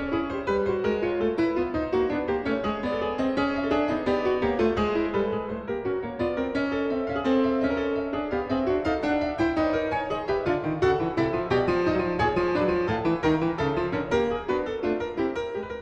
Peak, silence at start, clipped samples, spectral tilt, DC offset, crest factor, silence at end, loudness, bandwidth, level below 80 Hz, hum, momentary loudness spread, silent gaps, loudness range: -10 dBFS; 0 s; under 0.1%; -7 dB/octave; under 0.1%; 16 dB; 0 s; -26 LUFS; 8.4 kHz; -46 dBFS; none; 5 LU; none; 2 LU